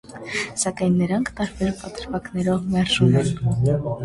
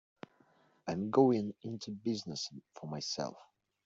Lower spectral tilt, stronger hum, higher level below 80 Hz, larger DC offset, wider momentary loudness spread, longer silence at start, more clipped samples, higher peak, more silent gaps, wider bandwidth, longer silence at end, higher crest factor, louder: about the same, -5.5 dB/octave vs -5.5 dB/octave; neither; first, -44 dBFS vs -76 dBFS; neither; second, 11 LU vs 20 LU; second, 0.05 s vs 0.85 s; neither; first, -4 dBFS vs -14 dBFS; neither; first, 11.5 kHz vs 7.8 kHz; second, 0 s vs 0.4 s; second, 16 dB vs 22 dB; first, -22 LUFS vs -35 LUFS